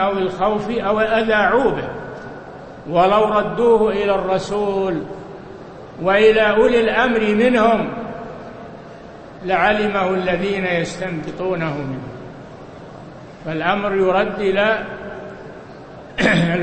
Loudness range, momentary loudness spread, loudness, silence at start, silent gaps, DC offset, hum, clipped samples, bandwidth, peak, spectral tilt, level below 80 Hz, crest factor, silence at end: 6 LU; 22 LU; -17 LUFS; 0 s; none; under 0.1%; none; under 0.1%; 8.8 kHz; -2 dBFS; -6 dB/octave; -44 dBFS; 18 dB; 0 s